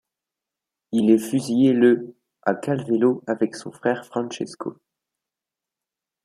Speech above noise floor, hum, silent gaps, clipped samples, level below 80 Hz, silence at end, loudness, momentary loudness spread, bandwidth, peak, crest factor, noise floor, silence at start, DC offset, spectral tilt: 67 dB; none; none; under 0.1%; -70 dBFS; 1.55 s; -22 LUFS; 13 LU; 13.5 kHz; -4 dBFS; 18 dB; -88 dBFS; 0.9 s; under 0.1%; -6.5 dB/octave